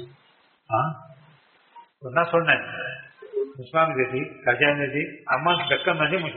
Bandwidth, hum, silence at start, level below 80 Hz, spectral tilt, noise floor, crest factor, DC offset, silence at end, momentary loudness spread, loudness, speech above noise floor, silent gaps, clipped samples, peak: 4.3 kHz; none; 0 s; -66 dBFS; -2.5 dB/octave; -61 dBFS; 22 dB; under 0.1%; 0 s; 13 LU; -23 LUFS; 37 dB; none; under 0.1%; -2 dBFS